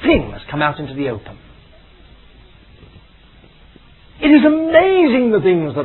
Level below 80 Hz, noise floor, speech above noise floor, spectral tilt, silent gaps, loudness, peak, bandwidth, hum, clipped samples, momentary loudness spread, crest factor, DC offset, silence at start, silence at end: -40 dBFS; -46 dBFS; 32 dB; -10 dB/octave; none; -14 LUFS; 0 dBFS; 4.2 kHz; none; under 0.1%; 13 LU; 16 dB; under 0.1%; 0 s; 0 s